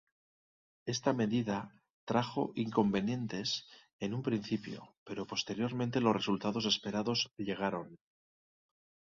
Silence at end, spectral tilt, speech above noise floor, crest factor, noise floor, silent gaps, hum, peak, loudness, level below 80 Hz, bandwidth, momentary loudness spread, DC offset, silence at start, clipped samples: 1.05 s; -5 dB/octave; over 56 dB; 20 dB; under -90 dBFS; 1.90-2.07 s, 3.93-3.99 s, 4.97-5.06 s; none; -16 dBFS; -35 LUFS; -70 dBFS; 7.4 kHz; 12 LU; under 0.1%; 0.85 s; under 0.1%